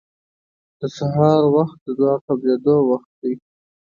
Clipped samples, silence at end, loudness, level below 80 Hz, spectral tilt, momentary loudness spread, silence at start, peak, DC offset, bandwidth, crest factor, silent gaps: under 0.1%; 0.6 s; -18 LUFS; -60 dBFS; -9 dB/octave; 12 LU; 0.8 s; -2 dBFS; under 0.1%; 7.2 kHz; 16 dB; 1.81-1.86 s, 2.21-2.28 s, 3.05-3.22 s